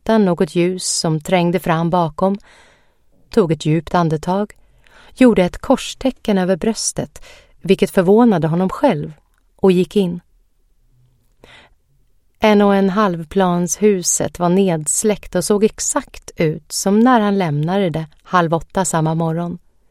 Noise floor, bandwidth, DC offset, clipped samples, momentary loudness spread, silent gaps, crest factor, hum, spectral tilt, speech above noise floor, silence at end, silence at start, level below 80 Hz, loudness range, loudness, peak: -56 dBFS; 15.5 kHz; under 0.1%; under 0.1%; 9 LU; none; 16 dB; none; -5 dB/octave; 40 dB; 0.35 s; 0.05 s; -44 dBFS; 4 LU; -16 LUFS; 0 dBFS